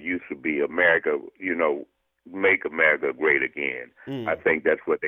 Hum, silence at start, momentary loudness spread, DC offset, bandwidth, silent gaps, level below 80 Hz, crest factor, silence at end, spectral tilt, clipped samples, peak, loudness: none; 0 s; 11 LU; under 0.1%; 3.9 kHz; none; -64 dBFS; 20 dB; 0 s; -7.5 dB/octave; under 0.1%; -6 dBFS; -23 LUFS